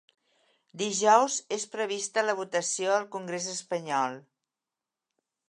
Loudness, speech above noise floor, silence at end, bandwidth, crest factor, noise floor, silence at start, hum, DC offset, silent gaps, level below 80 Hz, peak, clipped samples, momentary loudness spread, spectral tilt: -28 LUFS; 61 dB; 1.3 s; 11.5 kHz; 22 dB; -90 dBFS; 0.75 s; none; under 0.1%; none; -86 dBFS; -8 dBFS; under 0.1%; 12 LU; -2 dB/octave